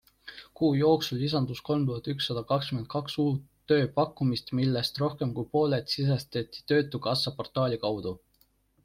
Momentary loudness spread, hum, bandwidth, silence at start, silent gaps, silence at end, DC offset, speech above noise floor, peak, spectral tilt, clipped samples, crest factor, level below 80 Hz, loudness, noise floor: 10 LU; none; 15.5 kHz; 0.25 s; none; 0.65 s; under 0.1%; 40 dB; -12 dBFS; -6.5 dB/octave; under 0.1%; 18 dB; -60 dBFS; -29 LUFS; -68 dBFS